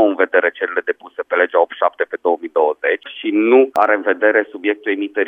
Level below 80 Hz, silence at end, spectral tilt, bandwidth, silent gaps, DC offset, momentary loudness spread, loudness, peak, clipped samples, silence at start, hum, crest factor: -74 dBFS; 0 s; -5.5 dB/octave; 5.6 kHz; none; under 0.1%; 8 LU; -17 LUFS; 0 dBFS; under 0.1%; 0 s; none; 16 dB